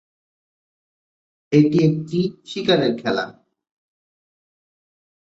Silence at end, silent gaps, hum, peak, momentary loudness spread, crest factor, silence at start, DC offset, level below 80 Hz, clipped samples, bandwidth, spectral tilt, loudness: 2.05 s; none; none; -2 dBFS; 9 LU; 20 dB; 1.5 s; under 0.1%; -62 dBFS; under 0.1%; 8 kHz; -7 dB/octave; -19 LUFS